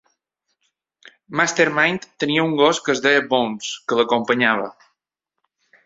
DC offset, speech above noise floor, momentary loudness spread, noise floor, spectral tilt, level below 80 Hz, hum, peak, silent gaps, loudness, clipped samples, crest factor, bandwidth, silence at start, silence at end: under 0.1%; 63 dB; 8 LU; -82 dBFS; -3.5 dB/octave; -64 dBFS; none; -2 dBFS; none; -19 LUFS; under 0.1%; 20 dB; 8 kHz; 1.3 s; 1.15 s